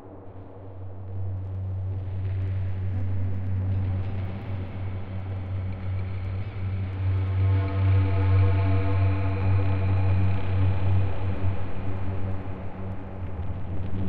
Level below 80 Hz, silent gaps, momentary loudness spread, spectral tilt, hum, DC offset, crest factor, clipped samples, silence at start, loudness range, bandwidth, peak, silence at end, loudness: -42 dBFS; none; 13 LU; -10.5 dB/octave; none; under 0.1%; 12 dB; under 0.1%; 0 s; 7 LU; 4.4 kHz; -12 dBFS; 0 s; -28 LUFS